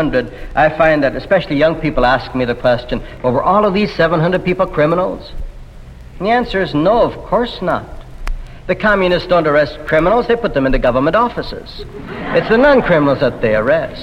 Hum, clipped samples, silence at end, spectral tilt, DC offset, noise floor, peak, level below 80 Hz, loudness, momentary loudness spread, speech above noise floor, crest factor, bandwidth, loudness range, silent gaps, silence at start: none; under 0.1%; 0 s; -7.5 dB/octave; under 0.1%; -34 dBFS; 0 dBFS; -30 dBFS; -14 LUFS; 16 LU; 20 dB; 14 dB; 11 kHz; 3 LU; none; 0 s